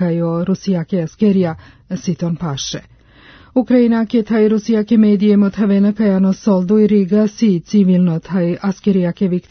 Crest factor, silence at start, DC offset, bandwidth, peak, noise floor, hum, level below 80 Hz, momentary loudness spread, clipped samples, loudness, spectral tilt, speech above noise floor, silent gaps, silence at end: 14 dB; 0 s; under 0.1%; 6.6 kHz; -2 dBFS; -44 dBFS; none; -50 dBFS; 9 LU; under 0.1%; -15 LUFS; -7.5 dB/octave; 30 dB; none; 0.1 s